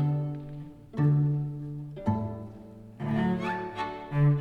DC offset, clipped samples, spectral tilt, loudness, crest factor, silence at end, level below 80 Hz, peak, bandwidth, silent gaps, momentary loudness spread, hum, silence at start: under 0.1%; under 0.1%; -9.5 dB/octave; -30 LUFS; 14 dB; 0 s; -54 dBFS; -14 dBFS; 4.7 kHz; none; 17 LU; none; 0 s